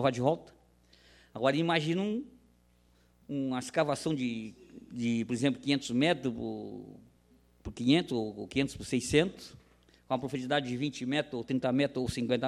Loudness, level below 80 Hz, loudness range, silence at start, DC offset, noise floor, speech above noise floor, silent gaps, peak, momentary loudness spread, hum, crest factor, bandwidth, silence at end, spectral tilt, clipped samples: -32 LUFS; -60 dBFS; 3 LU; 0 s; under 0.1%; -66 dBFS; 35 dB; none; -12 dBFS; 17 LU; 60 Hz at -65 dBFS; 20 dB; 13 kHz; 0 s; -5.5 dB/octave; under 0.1%